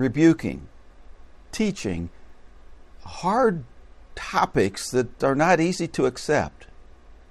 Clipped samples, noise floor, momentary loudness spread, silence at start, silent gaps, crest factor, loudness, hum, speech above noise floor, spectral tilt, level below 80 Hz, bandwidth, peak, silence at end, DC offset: under 0.1%; -47 dBFS; 17 LU; 0 s; none; 20 dB; -23 LUFS; none; 24 dB; -5.5 dB/octave; -48 dBFS; 13 kHz; -4 dBFS; 0.15 s; under 0.1%